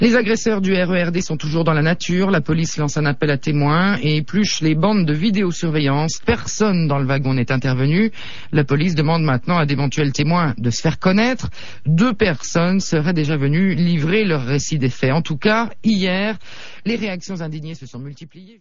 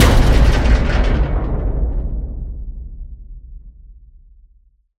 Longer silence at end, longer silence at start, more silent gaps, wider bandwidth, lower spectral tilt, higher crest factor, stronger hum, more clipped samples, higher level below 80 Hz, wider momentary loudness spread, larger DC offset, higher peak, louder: second, 0 s vs 1.05 s; about the same, 0 s vs 0 s; neither; second, 7.6 kHz vs 14 kHz; about the same, -6 dB/octave vs -6 dB/octave; about the same, 14 dB vs 16 dB; neither; neither; second, -44 dBFS vs -18 dBFS; second, 8 LU vs 23 LU; first, 4% vs under 0.1%; about the same, -4 dBFS vs -2 dBFS; about the same, -18 LUFS vs -18 LUFS